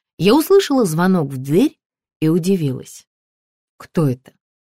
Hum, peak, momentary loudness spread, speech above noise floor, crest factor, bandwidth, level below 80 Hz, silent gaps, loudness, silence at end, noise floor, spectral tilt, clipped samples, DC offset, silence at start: none; -2 dBFS; 10 LU; over 74 dB; 16 dB; 16 kHz; -54 dBFS; 1.86-1.90 s, 2.16-2.20 s, 3.07-3.79 s; -17 LUFS; 0.5 s; under -90 dBFS; -6.5 dB/octave; under 0.1%; 0.4%; 0.2 s